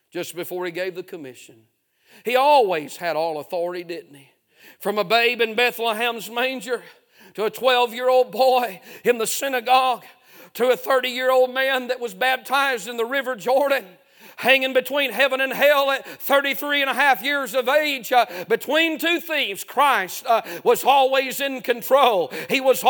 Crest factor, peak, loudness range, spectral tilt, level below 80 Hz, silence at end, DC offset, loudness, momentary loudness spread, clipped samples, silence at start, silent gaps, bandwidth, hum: 20 dB; 0 dBFS; 4 LU; -2 dB/octave; -80 dBFS; 0 s; under 0.1%; -20 LUFS; 11 LU; under 0.1%; 0.15 s; none; 19.5 kHz; none